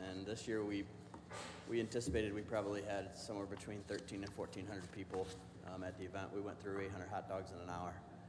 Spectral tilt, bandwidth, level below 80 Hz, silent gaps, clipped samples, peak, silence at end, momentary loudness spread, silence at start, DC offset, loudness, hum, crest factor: -5.5 dB/octave; 11 kHz; -64 dBFS; none; under 0.1%; -26 dBFS; 0 s; 9 LU; 0 s; under 0.1%; -45 LUFS; none; 18 dB